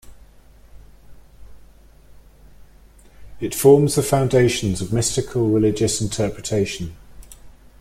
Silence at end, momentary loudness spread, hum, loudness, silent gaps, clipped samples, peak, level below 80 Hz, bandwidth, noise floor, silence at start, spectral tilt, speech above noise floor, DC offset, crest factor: 0.3 s; 12 LU; none; -19 LUFS; none; under 0.1%; -2 dBFS; -44 dBFS; 16 kHz; -48 dBFS; 0.05 s; -5.5 dB/octave; 29 dB; under 0.1%; 20 dB